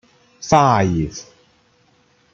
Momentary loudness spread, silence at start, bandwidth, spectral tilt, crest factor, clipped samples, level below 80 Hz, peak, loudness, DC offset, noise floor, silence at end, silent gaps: 20 LU; 0.4 s; 8.2 kHz; -6 dB/octave; 18 dB; under 0.1%; -44 dBFS; -2 dBFS; -17 LUFS; under 0.1%; -58 dBFS; 1.1 s; none